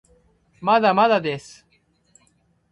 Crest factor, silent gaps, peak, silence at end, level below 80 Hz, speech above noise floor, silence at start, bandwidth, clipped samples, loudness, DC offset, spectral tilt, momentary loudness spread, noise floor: 20 dB; none; -4 dBFS; 1.35 s; -64 dBFS; 45 dB; 0.6 s; 11.5 kHz; under 0.1%; -19 LUFS; under 0.1%; -5.5 dB/octave; 12 LU; -64 dBFS